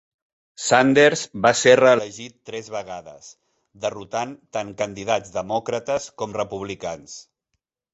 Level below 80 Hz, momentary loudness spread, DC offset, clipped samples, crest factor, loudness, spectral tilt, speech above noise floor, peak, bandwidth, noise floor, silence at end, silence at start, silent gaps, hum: -60 dBFS; 20 LU; under 0.1%; under 0.1%; 20 dB; -21 LUFS; -3.5 dB/octave; 57 dB; -2 dBFS; 8.2 kHz; -78 dBFS; 0.75 s; 0.6 s; none; none